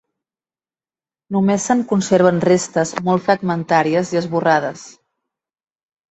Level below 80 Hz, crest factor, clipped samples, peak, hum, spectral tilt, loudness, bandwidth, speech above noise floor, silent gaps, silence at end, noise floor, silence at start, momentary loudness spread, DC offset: -60 dBFS; 18 dB; under 0.1%; -2 dBFS; none; -5.5 dB/octave; -17 LUFS; 8.2 kHz; over 74 dB; none; 1.2 s; under -90 dBFS; 1.3 s; 6 LU; under 0.1%